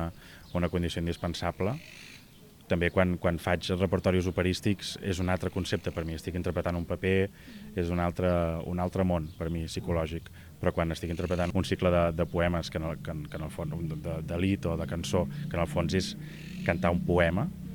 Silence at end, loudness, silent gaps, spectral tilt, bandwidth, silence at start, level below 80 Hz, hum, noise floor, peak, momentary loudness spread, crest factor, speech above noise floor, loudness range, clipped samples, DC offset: 0 s; -30 LUFS; none; -6.5 dB/octave; over 20 kHz; 0 s; -46 dBFS; none; -53 dBFS; -10 dBFS; 10 LU; 20 dB; 24 dB; 2 LU; under 0.1%; under 0.1%